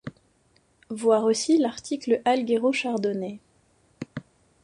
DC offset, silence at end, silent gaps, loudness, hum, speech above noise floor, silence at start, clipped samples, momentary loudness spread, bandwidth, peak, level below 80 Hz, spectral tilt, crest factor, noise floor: under 0.1%; 0.4 s; none; -24 LUFS; none; 41 dB; 0.05 s; under 0.1%; 19 LU; 11 kHz; -8 dBFS; -68 dBFS; -4.5 dB/octave; 18 dB; -64 dBFS